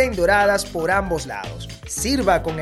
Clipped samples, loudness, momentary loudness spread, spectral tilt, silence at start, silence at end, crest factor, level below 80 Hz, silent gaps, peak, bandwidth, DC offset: under 0.1%; -20 LUFS; 13 LU; -4 dB/octave; 0 s; 0 s; 16 dB; -36 dBFS; none; -4 dBFS; 15.5 kHz; under 0.1%